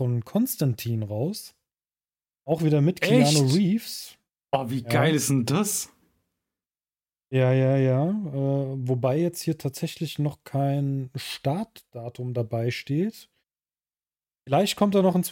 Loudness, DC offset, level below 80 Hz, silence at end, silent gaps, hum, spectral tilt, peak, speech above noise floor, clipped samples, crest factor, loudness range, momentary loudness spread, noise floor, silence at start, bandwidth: -25 LUFS; under 0.1%; -66 dBFS; 0 s; none; none; -5.5 dB/octave; -8 dBFS; over 66 dB; under 0.1%; 18 dB; 6 LU; 11 LU; under -90 dBFS; 0 s; 17 kHz